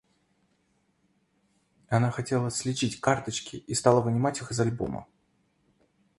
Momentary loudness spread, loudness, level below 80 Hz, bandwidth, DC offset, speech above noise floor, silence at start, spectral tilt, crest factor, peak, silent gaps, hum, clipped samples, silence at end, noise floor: 11 LU; -28 LUFS; -58 dBFS; 11.5 kHz; under 0.1%; 44 dB; 1.9 s; -5 dB/octave; 24 dB; -6 dBFS; none; none; under 0.1%; 1.15 s; -71 dBFS